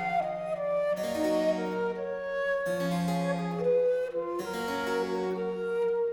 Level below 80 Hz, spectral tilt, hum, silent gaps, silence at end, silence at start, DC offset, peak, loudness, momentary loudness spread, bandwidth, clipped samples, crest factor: -64 dBFS; -6 dB/octave; none; none; 0 s; 0 s; under 0.1%; -18 dBFS; -30 LUFS; 6 LU; 19 kHz; under 0.1%; 12 dB